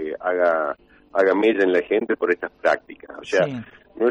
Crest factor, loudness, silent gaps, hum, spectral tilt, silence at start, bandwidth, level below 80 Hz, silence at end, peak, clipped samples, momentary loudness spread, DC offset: 14 dB; -21 LUFS; none; none; -5.5 dB/octave; 0 s; 8.8 kHz; -62 dBFS; 0 s; -6 dBFS; under 0.1%; 13 LU; under 0.1%